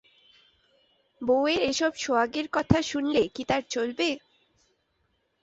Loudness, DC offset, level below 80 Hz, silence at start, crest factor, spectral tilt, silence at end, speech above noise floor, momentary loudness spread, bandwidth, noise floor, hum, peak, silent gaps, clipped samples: -26 LUFS; under 0.1%; -52 dBFS; 1.2 s; 24 dB; -4.5 dB/octave; 1.25 s; 47 dB; 5 LU; 8 kHz; -73 dBFS; none; -4 dBFS; none; under 0.1%